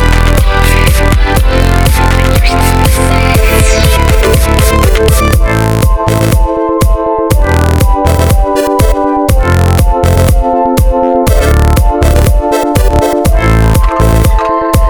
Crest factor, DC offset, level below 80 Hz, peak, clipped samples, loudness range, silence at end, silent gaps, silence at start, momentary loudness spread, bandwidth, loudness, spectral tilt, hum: 6 dB; under 0.1%; -10 dBFS; 0 dBFS; 2%; 1 LU; 0 s; none; 0 s; 2 LU; over 20 kHz; -9 LUFS; -5.5 dB/octave; none